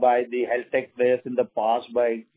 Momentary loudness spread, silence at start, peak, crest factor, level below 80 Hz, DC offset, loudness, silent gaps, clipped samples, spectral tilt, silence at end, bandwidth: 4 LU; 0 s; -8 dBFS; 16 dB; -70 dBFS; under 0.1%; -24 LUFS; none; under 0.1%; -9 dB/octave; 0.15 s; 4 kHz